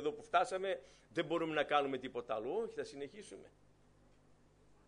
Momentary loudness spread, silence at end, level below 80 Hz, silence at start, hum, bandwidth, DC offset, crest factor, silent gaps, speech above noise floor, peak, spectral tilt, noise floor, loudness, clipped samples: 15 LU; 1.4 s; -74 dBFS; 0 s; 50 Hz at -75 dBFS; 10.5 kHz; under 0.1%; 22 dB; none; 29 dB; -18 dBFS; -4.5 dB/octave; -67 dBFS; -38 LUFS; under 0.1%